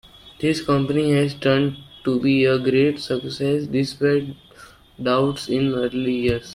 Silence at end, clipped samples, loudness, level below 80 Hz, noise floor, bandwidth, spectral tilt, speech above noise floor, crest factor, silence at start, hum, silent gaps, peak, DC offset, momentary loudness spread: 0 s; under 0.1%; -21 LUFS; -50 dBFS; -47 dBFS; 13.5 kHz; -6.5 dB/octave; 27 dB; 16 dB; 0.25 s; none; none; -4 dBFS; under 0.1%; 8 LU